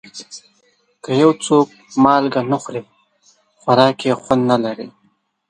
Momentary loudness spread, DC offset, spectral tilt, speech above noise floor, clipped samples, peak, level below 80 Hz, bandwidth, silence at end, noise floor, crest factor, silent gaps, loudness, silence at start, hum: 20 LU; under 0.1%; -5.5 dB/octave; 46 dB; under 0.1%; 0 dBFS; -58 dBFS; 9.8 kHz; 0.6 s; -62 dBFS; 18 dB; none; -16 LUFS; 0.15 s; none